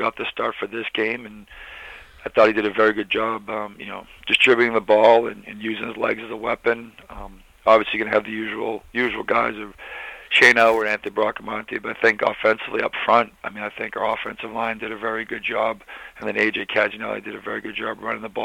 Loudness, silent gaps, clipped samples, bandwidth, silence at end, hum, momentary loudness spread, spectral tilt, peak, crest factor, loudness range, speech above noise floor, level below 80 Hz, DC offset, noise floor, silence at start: -21 LUFS; none; under 0.1%; 15.5 kHz; 0 s; none; 19 LU; -4 dB/octave; -2 dBFS; 20 dB; 6 LU; 19 dB; -54 dBFS; under 0.1%; -41 dBFS; 0 s